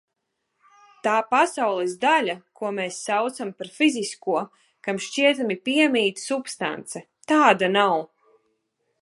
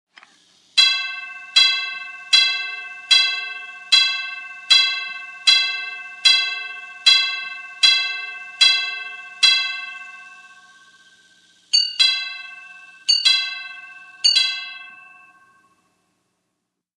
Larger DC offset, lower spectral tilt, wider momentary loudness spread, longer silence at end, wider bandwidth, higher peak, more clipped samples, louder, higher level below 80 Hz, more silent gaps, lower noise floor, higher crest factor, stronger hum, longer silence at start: neither; first, -3.5 dB/octave vs 5 dB/octave; second, 14 LU vs 17 LU; second, 0.95 s vs 1.95 s; about the same, 11.5 kHz vs 12.5 kHz; about the same, -2 dBFS vs -2 dBFS; neither; second, -23 LUFS vs -16 LUFS; first, -78 dBFS vs -90 dBFS; neither; about the same, -78 dBFS vs -77 dBFS; about the same, 22 dB vs 20 dB; neither; first, 1.05 s vs 0.75 s